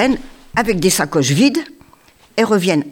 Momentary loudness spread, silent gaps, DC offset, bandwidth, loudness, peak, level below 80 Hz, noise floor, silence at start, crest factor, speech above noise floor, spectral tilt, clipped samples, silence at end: 10 LU; none; under 0.1%; 19 kHz; -16 LUFS; -2 dBFS; -42 dBFS; -49 dBFS; 0 s; 16 dB; 34 dB; -4.5 dB/octave; under 0.1%; 0 s